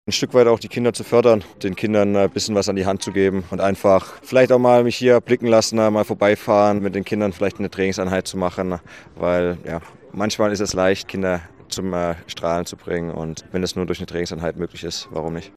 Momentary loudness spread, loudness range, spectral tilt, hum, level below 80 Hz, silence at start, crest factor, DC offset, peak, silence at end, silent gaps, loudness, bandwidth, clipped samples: 12 LU; 8 LU; -5 dB/octave; none; -52 dBFS; 0.05 s; 18 dB; under 0.1%; -2 dBFS; 0.1 s; none; -20 LUFS; 14.5 kHz; under 0.1%